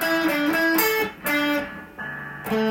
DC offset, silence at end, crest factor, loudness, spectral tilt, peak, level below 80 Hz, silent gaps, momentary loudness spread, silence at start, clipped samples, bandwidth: under 0.1%; 0 s; 16 dB; -22 LUFS; -3.5 dB/octave; -6 dBFS; -56 dBFS; none; 14 LU; 0 s; under 0.1%; 17 kHz